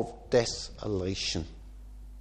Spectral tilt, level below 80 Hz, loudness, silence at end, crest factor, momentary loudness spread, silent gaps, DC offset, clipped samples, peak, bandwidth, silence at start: -4 dB/octave; -46 dBFS; -31 LUFS; 0 s; 22 dB; 22 LU; none; under 0.1%; under 0.1%; -12 dBFS; 9.8 kHz; 0 s